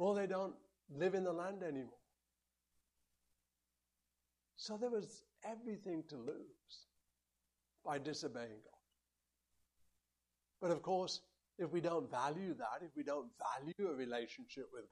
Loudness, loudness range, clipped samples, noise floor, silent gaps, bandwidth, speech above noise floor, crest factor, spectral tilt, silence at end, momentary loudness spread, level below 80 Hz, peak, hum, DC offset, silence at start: -44 LUFS; 8 LU; under 0.1%; -89 dBFS; none; 11.5 kHz; 46 dB; 20 dB; -5 dB/octave; 0.05 s; 16 LU; -86 dBFS; -26 dBFS; 60 Hz at -85 dBFS; under 0.1%; 0 s